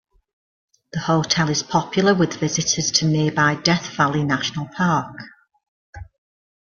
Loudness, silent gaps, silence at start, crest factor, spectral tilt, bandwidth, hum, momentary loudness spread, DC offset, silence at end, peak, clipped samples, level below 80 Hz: -19 LUFS; 5.68-5.93 s; 0.95 s; 20 dB; -4 dB/octave; 7.4 kHz; none; 7 LU; under 0.1%; 0.7 s; -2 dBFS; under 0.1%; -52 dBFS